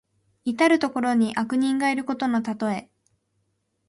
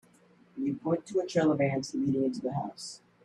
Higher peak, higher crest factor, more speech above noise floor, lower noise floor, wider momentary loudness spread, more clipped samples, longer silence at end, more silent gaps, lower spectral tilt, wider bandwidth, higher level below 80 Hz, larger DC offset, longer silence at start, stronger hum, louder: first, -8 dBFS vs -14 dBFS; about the same, 18 dB vs 16 dB; first, 50 dB vs 32 dB; first, -73 dBFS vs -61 dBFS; second, 10 LU vs 14 LU; neither; first, 1.05 s vs 0.3 s; neither; second, -5 dB/octave vs -6.5 dB/octave; about the same, 11.5 kHz vs 11.5 kHz; about the same, -68 dBFS vs -68 dBFS; neither; about the same, 0.45 s vs 0.55 s; neither; first, -24 LUFS vs -30 LUFS